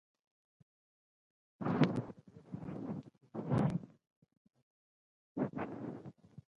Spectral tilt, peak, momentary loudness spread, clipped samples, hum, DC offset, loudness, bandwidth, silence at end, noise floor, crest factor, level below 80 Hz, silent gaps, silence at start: -8.5 dB/octave; -14 dBFS; 18 LU; under 0.1%; none; under 0.1%; -39 LUFS; 10.5 kHz; 0.15 s; under -90 dBFS; 28 dB; -68 dBFS; 4.16-4.22 s, 4.37-4.45 s, 4.62-5.35 s; 1.6 s